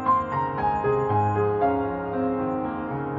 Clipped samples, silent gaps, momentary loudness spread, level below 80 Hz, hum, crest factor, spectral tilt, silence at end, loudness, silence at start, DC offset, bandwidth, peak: under 0.1%; none; 5 LU; -50 dBFS; none; 14 dB; -9.5 dB/octave; 0 s; -25 LUFS; 0 s; under 0.1%; 7.4 kHz; -10 dBFS